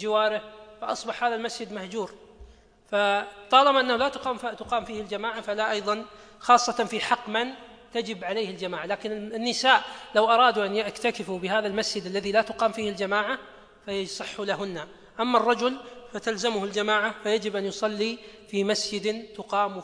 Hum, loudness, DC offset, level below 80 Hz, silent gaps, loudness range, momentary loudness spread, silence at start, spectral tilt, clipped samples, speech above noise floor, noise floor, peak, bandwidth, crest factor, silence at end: none; -26 LUFS; under 0.1%; -62 dBFS; none; 4 LU; 13 LU; 0 s; -3 dB/octave; under 0.1%; 25 dB; -51 dBFS; -4 dBFS; 10.5 kHz; 22 dB; 0 s